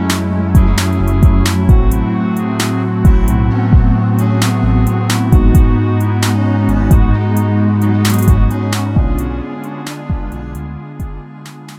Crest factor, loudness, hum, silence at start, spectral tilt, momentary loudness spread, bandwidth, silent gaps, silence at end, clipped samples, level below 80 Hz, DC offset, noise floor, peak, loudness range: 12 dB; -13 LUFS; none; 0 s; -6.5 dB/octave; 14 LU; 16 kHz; none; 0 s; under 0.1%; -16 dBFS; under 0.1%; -32 dBFS; 0 dBFS; 4 LU